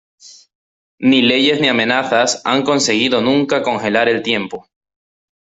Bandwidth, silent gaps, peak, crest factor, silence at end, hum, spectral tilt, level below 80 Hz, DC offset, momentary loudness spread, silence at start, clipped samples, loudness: 8.2 kHz; 0.55-0.98 s; -2 dBFS; 14 dB; 0.8 s; none; -3.5 dB/octave; -58 dBFS; under 0.1%; 6 LU; 0.25 s; under 0.1%; -14 LUFS